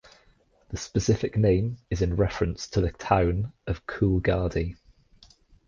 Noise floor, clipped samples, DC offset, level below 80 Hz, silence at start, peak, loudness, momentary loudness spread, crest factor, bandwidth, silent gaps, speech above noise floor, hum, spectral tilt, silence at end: -62 dBFS; under 0.1%; under 0.1%; -38 dBFS; 0.7 s; -6 dBFS; -26 LUFS; 10 LU; 20 dB; 7.4 kHz; none; 37 dB; none; -6.5 dB/octave; 0.95 s